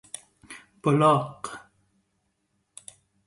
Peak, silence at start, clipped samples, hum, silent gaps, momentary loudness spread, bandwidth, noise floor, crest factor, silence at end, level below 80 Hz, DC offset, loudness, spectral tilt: -8 dBFS; 0.5 s; under 0.1%; none; none; 25 LU; 11.5 kHz; -74 dBFS; 22 dB; 1.7 s; -68 dBFS; under 0.1%; -23 LUFS; -6.5 dB/octave